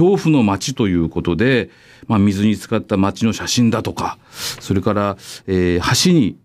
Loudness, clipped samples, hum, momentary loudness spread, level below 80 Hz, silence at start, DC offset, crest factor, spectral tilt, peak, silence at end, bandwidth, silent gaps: -17 LUFS; under 0.1%; none; 11 LU; -42 dBFS; 0 s; under 0.1%; 14 dB; -5.5 dB/octave; -4 dBFS; 0.1 s; 16 kHz; none